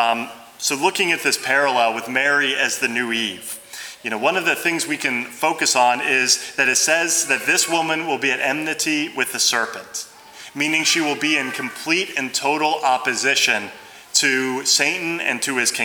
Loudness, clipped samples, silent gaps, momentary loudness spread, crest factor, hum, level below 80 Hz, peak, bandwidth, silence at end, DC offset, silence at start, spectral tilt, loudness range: -18 LUFS; under 0.1%; none; 10 LU; 20 dB; none; -72 dBFS; -2 dBFS; over 20 kHz; 0 s; under 0.1%; 0 s; -1 dB/octave; 3 LU